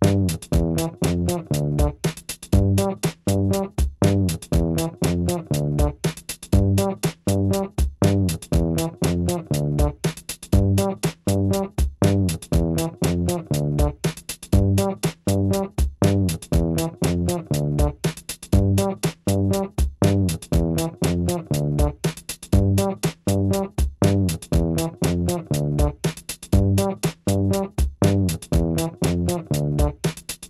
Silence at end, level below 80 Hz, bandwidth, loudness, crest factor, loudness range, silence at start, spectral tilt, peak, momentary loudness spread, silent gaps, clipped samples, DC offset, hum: 0.05 s; -30 dBFS; 14.5 kHz; -22 LUFS; 18 dB; 1 LU; 0 s; -6 dB/octave; -4 dBFS; 6 LU; none; under 0.1%; under 0.1%; none